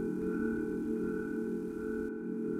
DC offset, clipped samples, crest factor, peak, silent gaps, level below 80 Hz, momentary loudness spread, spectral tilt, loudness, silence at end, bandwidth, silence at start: under 0.1%; under 0.1%; 14 dB; -22 dBFS; none; -58 dBFS; 3 LU; -8.5 dB/octave; -36 LUFS; 0 s; 14 kHz; 0 s